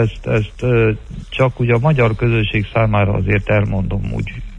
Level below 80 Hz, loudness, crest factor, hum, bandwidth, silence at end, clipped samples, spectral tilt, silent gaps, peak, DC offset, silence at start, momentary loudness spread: -30 dBFS; -17 LUFS; 14 dB; none; 7.6 kHz; 0 s; under 0.1%; -8.5 dB/octave; none; -2 dBFS; under 0.1%; 0 s; 7 LU